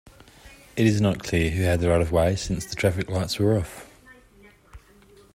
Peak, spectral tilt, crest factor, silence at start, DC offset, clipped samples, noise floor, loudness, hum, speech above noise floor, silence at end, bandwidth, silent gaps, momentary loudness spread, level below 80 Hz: -6 dBFS; -6 dB/octave; 18 dB; 0.45 s; under 0.1%; under 0.1%; -53 dBFS; -24 LUFS; none; 31 dB; 0.55 s; 15.5 kHz; none; 8 LU; -42 dBFS